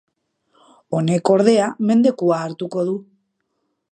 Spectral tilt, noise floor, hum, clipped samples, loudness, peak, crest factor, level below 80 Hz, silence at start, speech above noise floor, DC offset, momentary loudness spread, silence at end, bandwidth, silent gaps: -6.5 dB/octave; -73 dBFS; none; under 0.1%; -18 LUFS; -2 dBFS; 18 dB; -70 dBFS; 0.9 s; 56 dB; under 0.1%; 11 LU; 0.9 s; 9.4 kHz; none